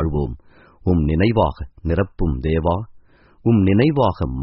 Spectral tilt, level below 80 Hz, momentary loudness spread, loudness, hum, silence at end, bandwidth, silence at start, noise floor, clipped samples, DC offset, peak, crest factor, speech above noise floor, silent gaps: -7.5 dB/octave; -30 dBFS; 12 LU; -19 LUFS; none; 0 s; 5.8 kHz; 0 s; -48 dBFS; under 0.1%; under 0.1%; -2 dBFS; 16 dB; 30 dB; none